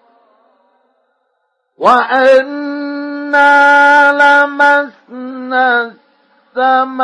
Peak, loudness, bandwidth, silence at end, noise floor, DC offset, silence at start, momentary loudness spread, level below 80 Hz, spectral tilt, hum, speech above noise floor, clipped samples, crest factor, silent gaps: 0 dBFS; -10 LUFS; 10 kHz; 0 s; -65 dBFS; under 0.1%; 1.8 s; 18 LU; -62 dBFS; -3 dB/octave; none; 56 dB; under 0.1%; 12 dB; none